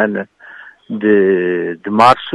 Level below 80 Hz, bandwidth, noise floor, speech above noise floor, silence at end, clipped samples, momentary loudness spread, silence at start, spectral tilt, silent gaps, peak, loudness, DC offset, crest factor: -56 dBFS; 11.5 kHz; -38 dBFS; 25 dB; 0 s; under 0.1%; 15 LU; 0 s; -6.5 dB/octave; none; 0 dBFS; -14 LUFS; under 0.1%; 14 dB